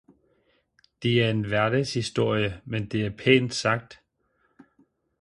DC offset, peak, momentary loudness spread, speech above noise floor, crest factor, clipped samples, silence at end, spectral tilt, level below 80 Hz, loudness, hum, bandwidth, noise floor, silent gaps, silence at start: under 0.1%; -4 dBFS; 9 LU; 46 dB; 22 dB; under 0.1%; 1.25 s; -5.5 dB/octave; -56 dBFS; -25 LUFS; none; 11.5 kHz; -70 dBFS; none; 1 s